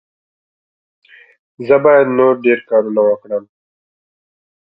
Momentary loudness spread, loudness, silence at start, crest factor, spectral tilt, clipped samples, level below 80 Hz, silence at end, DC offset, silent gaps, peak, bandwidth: 14 LU; -13 LUFS; 1.6 s; 16 dB; -9.5 dB/octave; under 0.1%; -64 dBFS; 1.3 s; under 0.1%; none; 0 dBFS; 5 kHz